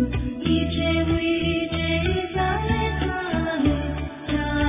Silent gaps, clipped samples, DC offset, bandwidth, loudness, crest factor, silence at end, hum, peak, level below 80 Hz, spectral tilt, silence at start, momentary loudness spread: none; under 0.1%; under 0.1%; 3.9 kHz; -24 LUFS; 16 dB; 0 s; none; -8 dBFS; -32 dBFS; -10.5 dB/octave; 0 s; 4 LU